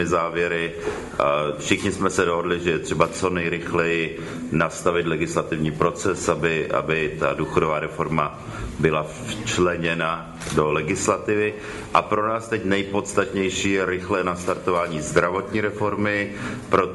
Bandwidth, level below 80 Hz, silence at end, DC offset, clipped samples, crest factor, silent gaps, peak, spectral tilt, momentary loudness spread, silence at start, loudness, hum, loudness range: 11.5 kHz; -46 dBFS; 0 s; under 0.1%; under 0.1%; 22 dB; none; 0 dBFS; -5 dB/octave; 5 LU; 0 s; -23 LUFS; none; 1 LU